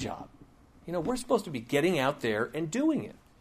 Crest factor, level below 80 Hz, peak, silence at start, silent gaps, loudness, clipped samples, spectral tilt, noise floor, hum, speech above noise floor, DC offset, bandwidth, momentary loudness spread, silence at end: 18 dB; -58 dBFS; -14 dBFS; 0 s; none; -30 LUFS; under 0.1%; -5.5 dB/octave; -56 dBFS; none; 26 dB; under 0.1%; 15.5 kHz; 17 LU; 0.25 s